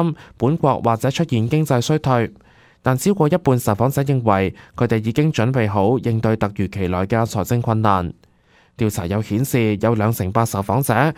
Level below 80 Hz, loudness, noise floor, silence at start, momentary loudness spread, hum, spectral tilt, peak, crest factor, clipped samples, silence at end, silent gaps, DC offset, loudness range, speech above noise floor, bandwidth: -46 dBFS; -19 LUFS; -55 dBFS; 0 s; 5 LU; none; -6.5 dB/octave; -2 dBFS; 18 dB; under 0.1%; 0.05 s; none; under 0.1%; 2 LU; 37 dB; 16 kHz